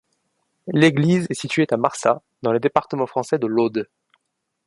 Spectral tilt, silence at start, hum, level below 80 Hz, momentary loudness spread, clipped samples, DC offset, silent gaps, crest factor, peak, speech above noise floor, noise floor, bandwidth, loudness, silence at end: -6 dB/octave; 0.65 s; none; -64 dBFS; 8 LU; under 0.1%; under 0.1%; none; 22 dB; 0 dBFS; 56 dB; -76 dBFS; 11.5 kHz; -20 LUFS; 0.8 s